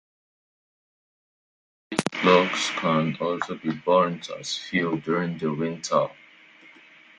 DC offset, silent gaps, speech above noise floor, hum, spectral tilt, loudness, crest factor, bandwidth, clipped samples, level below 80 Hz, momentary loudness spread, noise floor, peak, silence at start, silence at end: under 0.1%; none; 27 dB; none; -4.5 dB/octave; -24 LUFS; 26 dB; 11.5 kHz; under 0.1%; -68 dBFS; 11 LU; -52 dBFS; -2 dBFS; 1.9 s; 0.5 s